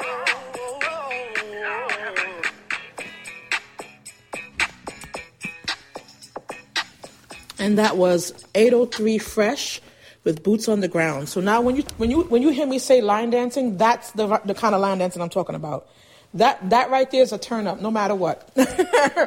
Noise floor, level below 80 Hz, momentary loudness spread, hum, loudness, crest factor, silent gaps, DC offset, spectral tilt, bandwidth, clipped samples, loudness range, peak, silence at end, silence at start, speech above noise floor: -45 dBFS; -52 dBFS; 17 LU; none; -22 LUFS; 16 dB; none; under 0.1%; -4.5 dB/octave; 16.5 kHz; under 0.1%; 10 LU; -6 dBFS; 0 s; 0 s; 25 dB